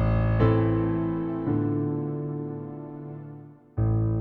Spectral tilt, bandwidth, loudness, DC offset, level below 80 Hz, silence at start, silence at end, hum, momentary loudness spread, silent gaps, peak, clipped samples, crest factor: -11.5 dB/octave; 4.3 kHz; -26 LUFS; under 0.1%; -38 dBFS; 0 s; 0 s; none; 17 LU; none; -8 dBFS; under 0.1%; 18 dB